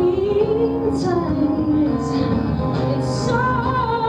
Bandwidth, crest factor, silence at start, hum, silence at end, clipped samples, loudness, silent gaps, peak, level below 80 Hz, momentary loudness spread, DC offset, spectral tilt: 10 kHz; 12 dB; 0 s; none; 0 s; under 0.1%; -19 LUFS; none; -6 dBFS; -36 dBFS; 2 LU; under 0.1%; -7.5 dB/octave